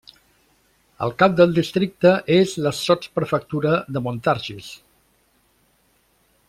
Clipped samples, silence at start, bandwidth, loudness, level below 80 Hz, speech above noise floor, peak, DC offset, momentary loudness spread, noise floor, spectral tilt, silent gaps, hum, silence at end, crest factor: under 0.1%; 1 s; 15 kHz; -20 LUFS; -56 dBFS; 43 dB; -2 dBFS; under 0.1%; 12 LU; -62 dBFS; -6 dB/octave; none; none; 1.75 s; 20 dB